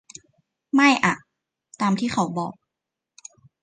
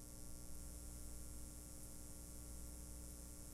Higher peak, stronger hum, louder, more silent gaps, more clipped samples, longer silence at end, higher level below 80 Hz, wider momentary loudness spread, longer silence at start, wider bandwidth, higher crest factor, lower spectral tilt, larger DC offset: first, -4 dBFS vs -36 dBFS; second, none vs 60 Hz at -55 dBFS; first, -22 LUFS vs -54 LUFS; neither; neither; first, 1.1 s vs 0 s; second, -64 dBFS vs -56 dBFS; first, 14 LU vs 1 LU; first, 0.75 s vs 0 s; second, 9.8 kHz vs 16 kHz; first, 22 dB vs 16 dB; about the same, -4.5 dB/octave vs -4 dB/octave; neither